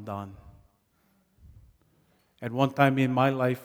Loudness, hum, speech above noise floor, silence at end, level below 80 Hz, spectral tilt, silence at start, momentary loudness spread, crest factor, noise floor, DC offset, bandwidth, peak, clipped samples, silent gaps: -26 LUFS; none; 43 dB; 0 s; -62 dBFS; -7.5 dB/octave; 0 s; 16 LU; 24 dB; -69 dBFS; under 0.1%; 17 kHz; -6 dBFS; under 0.1%; none